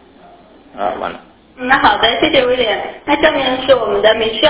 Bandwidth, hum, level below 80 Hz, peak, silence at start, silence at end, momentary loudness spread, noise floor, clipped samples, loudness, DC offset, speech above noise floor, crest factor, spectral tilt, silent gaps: 4 kHz; none; -42 dBFS; 0 dBFS; 0.75 s; 0 s; 11 LU; -42 dBFS; under 0.1%; -13 LUFS; under 0.1%; 29 dB; 14 dB; -7.5 dB/octave; none